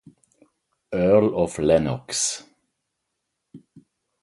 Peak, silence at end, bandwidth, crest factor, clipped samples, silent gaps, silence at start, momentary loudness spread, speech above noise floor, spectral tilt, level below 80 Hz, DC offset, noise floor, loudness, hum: -4 dBFS; 0.65 s; 11.5 kHz; 20 dB; under 0.1%; none; 0.9 s; 9 LU; 59 dB; -4.5 dB/octave; -50 dBFS; under 0.1%; -79 dBFS; -21 LUFS; none